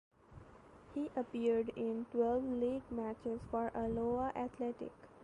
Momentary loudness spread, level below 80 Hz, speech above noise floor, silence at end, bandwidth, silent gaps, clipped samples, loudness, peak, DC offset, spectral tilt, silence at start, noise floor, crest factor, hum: 11 LU; -62 dBFS; 21 dB; 0 s; 9.8 kHz; none; under 0.1%; -39 LUFS; -24 dBFS; under 0.1%; -8 dB/octave; 0.3 s; -59 dBFS; 16 dB; none